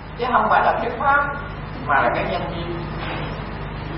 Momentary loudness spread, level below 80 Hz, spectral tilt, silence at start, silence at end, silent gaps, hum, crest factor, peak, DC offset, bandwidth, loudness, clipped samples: 13 LU; -36 dBFS; -10.5 dB/octave; 0 s; 0 s; none; none; 20 dB; -2 dBFS; under 0.1%; 5.8 kHz; -21 LUFS; under 0.1%